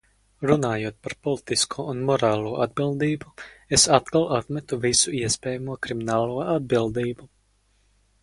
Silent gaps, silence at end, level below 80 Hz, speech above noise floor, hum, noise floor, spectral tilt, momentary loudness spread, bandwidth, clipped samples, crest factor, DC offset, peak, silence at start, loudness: none; 0.95 s; -52 dBFS; 40 dB; none; -64 dBFS; -3.5 dB/octave; 11 LU; 11.5 kHz; under 0.1%; 24 dB; under 0.1%; 0 dBFS; 0.4 s; -23 LUFS